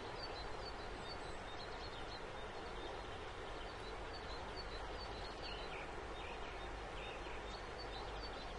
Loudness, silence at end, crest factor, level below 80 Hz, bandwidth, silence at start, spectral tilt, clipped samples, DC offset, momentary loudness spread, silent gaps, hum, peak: -48 LUFS; 0 s; 14 dB; -54 dBFS; 11 kHz; 0 s; -4.5 dB/octave; under 0.1%; under 0.1%; 2 LU; none; none; -34 dBFS